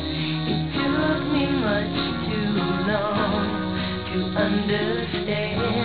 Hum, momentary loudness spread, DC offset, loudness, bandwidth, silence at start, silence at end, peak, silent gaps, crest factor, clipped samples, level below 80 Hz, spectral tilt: none; 3 LU; 0.5%; -23 LUFS; 4 kHz; 0 s; 0 s; -8 dBFS; none; 16 dB; under 0.1%; -42 dBFS; -10.5 dB/octave